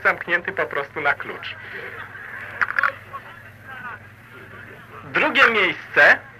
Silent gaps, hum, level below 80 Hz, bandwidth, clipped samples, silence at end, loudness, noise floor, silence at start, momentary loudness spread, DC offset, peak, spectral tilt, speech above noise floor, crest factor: none; none; -60 dBFS; 15.5 kHz; under 0.1%; 0.1 s; -19 LUFS; -43 dBFS; 0 s; 25 LU; under 0.1%; -4 dBFS; -4 dB/octave; 22 dB; 20 dB